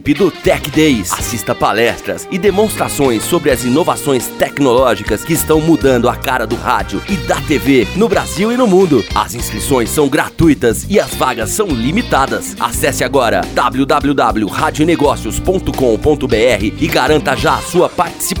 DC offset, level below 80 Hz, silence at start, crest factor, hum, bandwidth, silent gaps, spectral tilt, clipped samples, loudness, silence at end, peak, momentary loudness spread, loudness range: under 0.1%; -30 dBFS; 0 s; 12 dB; none; over 20 kHz; none; -4.5 dB/octave; under 0.1%; -13 LUFS; 0 s; 0 dBFS; 5 LU; 1 LU